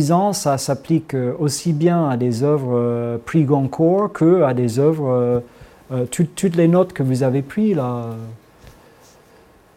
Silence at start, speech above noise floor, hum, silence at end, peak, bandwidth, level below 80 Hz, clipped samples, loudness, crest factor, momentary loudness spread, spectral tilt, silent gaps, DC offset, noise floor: 0 s; 32 dB; none; 1.05 s; -2 dBFS; 16 kHz; -54 dBFS; under 0.1%; -18 LUFS; 16 dB; 8 LU; -7 dB/octave; none; under 0.1%; -50 dBFS